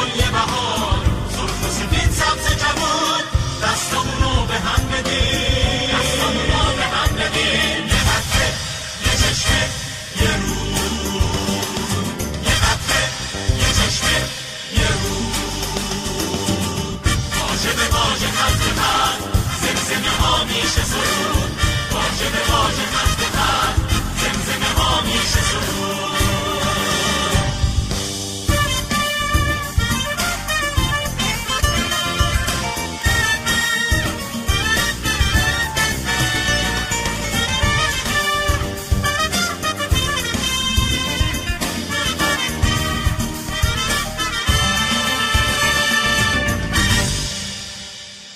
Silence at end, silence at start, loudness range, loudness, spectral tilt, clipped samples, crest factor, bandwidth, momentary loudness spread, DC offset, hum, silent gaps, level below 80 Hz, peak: 0 s; 0 s; 2 LU; -18 LUFS; -3 dB/octave; under 0.1%; 16 dB; 16 kHz; 5 LU; under 0.1%; none; none; -26 dBFS; -4 dBFS